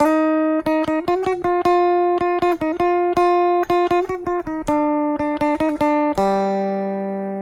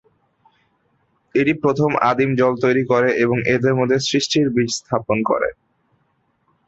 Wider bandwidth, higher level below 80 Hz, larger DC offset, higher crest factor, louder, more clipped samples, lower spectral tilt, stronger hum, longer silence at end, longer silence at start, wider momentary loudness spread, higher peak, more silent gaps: first, 14.5 kHz vs 8.2 kHz; first, -48 dBFS vs -56 dBFS; neither; about the same, 14 dB vs 16 dB; about the same, -19 LUFS vs -18 LUFS; neither; first, -6.5 dB/octave vs -5 dB/octave; neither; second, 0 s vs 1.15 s; second, 0 s vs 1.35 s; first, 7 LU vs 4 LU; about the same, -4 dBFS vs -2 dBFS; neither